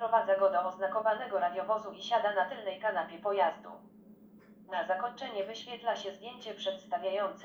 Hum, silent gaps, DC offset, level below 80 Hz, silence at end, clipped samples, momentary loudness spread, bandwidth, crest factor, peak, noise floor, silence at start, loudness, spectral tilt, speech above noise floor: none; none; under 0.1%; -82 dBFS; 0 s; under 0.1%; 11 LU; over 20 kHz; 20 dB; -14 dBFS; -57 dBFS; 0 s; -33 LUFS; -4 dB/octave; 24 dB